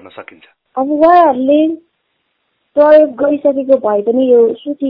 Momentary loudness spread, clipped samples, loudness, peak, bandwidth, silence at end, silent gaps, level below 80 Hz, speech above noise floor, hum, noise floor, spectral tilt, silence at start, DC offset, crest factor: 12 LU; 0.3%; -11 LUFS; 0 dBFS; 5.2 kHz; 0 s; none; -56 dBFS; 55 dB; none; -66 dBFS; -8.5 dB/octave; 0.05 s; under 0.1%; 12 dB